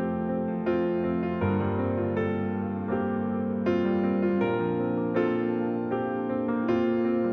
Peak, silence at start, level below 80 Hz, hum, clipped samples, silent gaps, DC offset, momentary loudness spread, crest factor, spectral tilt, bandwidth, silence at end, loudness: -12 dBFS; 0 s; -58 dBFS; none; under 0.1%; none; under 0.1%; 4 LU; 14 dB; -10 dB/octave; 5.6 kHz; 0 s; -27 LUFS